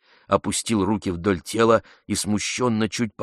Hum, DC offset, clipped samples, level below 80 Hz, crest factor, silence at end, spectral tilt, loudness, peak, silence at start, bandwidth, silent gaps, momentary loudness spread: none; under 0.1%; under 0.1%; -52 dBFS; 20 dB; 0 s; -4.5 dB/octave; -23 LUFS; -4 dBFS; 0.3 s; 13 kHz; none; 6 LU